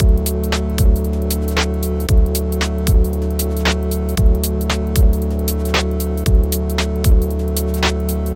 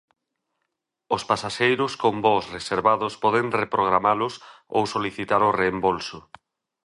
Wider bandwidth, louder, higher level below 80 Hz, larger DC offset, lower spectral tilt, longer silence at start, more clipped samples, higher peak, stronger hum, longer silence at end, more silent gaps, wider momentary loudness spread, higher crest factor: first, 17 kHz vs 11.5 kHz; first, -18 LUFS vs -23 LUFS; first, -18 dBFS vs -58 dBFS; neither; about the same, -5.5 dB/octave vs -5 dB/octave; second, 0 s vs 1.1 s; neither; about the same, -2 dBFS vs -4 dBFS; neither; second, 0 s vs 0.65 s; neither; second, 4 LU vs 8 LU; second, 14 dB vs 20 dB